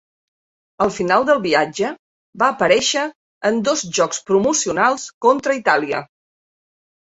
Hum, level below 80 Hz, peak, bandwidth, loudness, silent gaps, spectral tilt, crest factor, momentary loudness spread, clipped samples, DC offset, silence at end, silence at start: none; -58 dBFS; -2 dBFS; 8.2 kHz; -18 LUFS; 1.99-2.33 s, 3.15-3.41 s, 5.14-5.21 s; -3 dB/octave; 18 dB; 8 LU; under 0.1%; under 0.1%; 1 s; 0.8 s